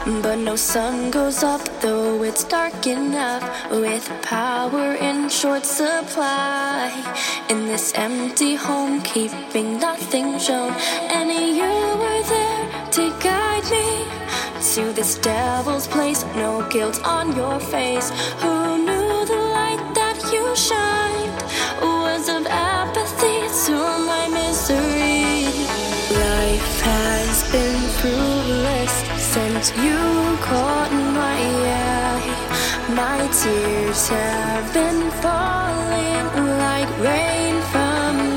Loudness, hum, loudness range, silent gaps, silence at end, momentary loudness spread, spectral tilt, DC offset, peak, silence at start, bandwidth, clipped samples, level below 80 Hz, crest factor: -20 LUFS; none; 2 LU; none; 0 s; 4 LU; -3 dB/octave; under 0.1%; -4 dBFS; 0 s; 17 kHz; under 0.1%; -34 dBFS; 16 dB